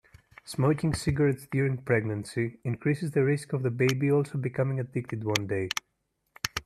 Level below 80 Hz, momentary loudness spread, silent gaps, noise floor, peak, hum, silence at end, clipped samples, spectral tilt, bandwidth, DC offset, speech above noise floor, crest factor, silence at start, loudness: -54 dBFS; 7 LU; none; -75 dBFS; -6 dBFS; none; 0.05 s; under 0.1%; -6 dB/octave; 14 kHz; under 0.1%; 48 dB; 22 dB; 0.45 s; -29 LUFS